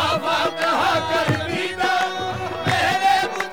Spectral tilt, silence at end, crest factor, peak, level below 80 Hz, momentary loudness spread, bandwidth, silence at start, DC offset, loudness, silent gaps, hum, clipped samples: -4 dB/octave; 0 s; 16 dB; -6 dBFS; -52 dBFS; 6 LU; 19 kHz; 0 s; 0.4%; -20 LUFS; none; none; under 0.1%